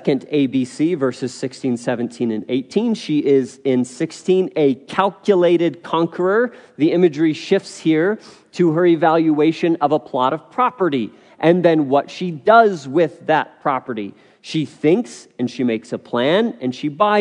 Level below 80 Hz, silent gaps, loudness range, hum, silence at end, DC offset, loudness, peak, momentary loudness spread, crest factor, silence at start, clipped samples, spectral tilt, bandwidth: -72 dBFS; none; 4 LU; none; 0 s; under 0.1%; -18 LUFS; 0 dBFS; 10 LU; 18 dB; 0 s; under 0.1%; -6.5 dB/octave; 10.5 kHz